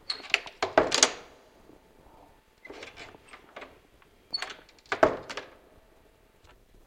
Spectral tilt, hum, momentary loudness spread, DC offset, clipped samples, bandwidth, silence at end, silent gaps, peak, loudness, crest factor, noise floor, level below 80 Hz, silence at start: -1 dB/octave; none; 25 LU; under 0.1%; under 0.1%; 16.5 kHz; 1.4 s; none; -2 dBFS; -27 LUFS; 30 dB; -60 dBFS; -60 dBFS; 0.1 s